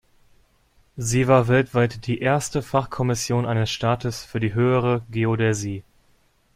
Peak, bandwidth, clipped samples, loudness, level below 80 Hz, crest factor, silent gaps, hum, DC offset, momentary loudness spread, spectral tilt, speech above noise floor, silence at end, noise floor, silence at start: -4 dBFS; 15 kHz; under 0.1%; -22 LUFS; -50 dBFS; 20 dB; none; none; under 0.1%; 10 LU; -5.5 dB/octave; 40 dB; 0.75 s; -61 dBFS; 0.95 s